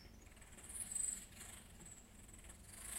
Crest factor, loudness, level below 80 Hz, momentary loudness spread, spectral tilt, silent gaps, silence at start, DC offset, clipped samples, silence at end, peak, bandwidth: 20 dB; -47 LUFS; -64 dBFS; 18 LU; -1.5 dB/octave; none; 0 s; under 0.1%; under 0.1%; 0 s; -30 dBFS; 16 kHz